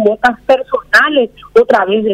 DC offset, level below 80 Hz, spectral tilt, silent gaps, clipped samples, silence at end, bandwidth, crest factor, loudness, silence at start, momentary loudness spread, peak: under 0.1%; -46 dBFS; -4.5 dB/octave; none; under 0.1%; 0 s; 15 kHz; 12 dB; -11 LUFS; 0 s; 5 LU; 0 dBFS